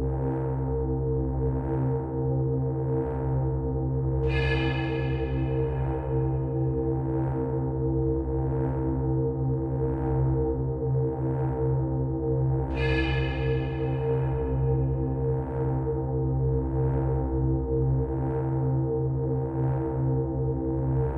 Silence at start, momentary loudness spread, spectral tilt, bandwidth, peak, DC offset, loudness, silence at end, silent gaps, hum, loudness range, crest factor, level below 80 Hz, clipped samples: 0 s; 2 LU; -10.5 dB/octave; 5 kHz; -14 dBFS; under 0.1%; -27 LUFS; 0 s; none; none; 1 LU; 12 dB; -34 dBFS; under 0.1%